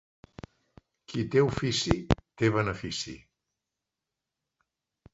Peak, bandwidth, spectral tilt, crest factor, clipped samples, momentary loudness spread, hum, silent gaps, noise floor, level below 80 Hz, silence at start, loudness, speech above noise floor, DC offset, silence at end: -4 dBFS; 8 kHz; -5.5 dB/octave; 28 dB; under 0.1%; 23 LU; none; none; -88 dBFS; -46 dBFS; 1.1 s; -29 LUFS; 60 dB; under 0.1%; 1.95 s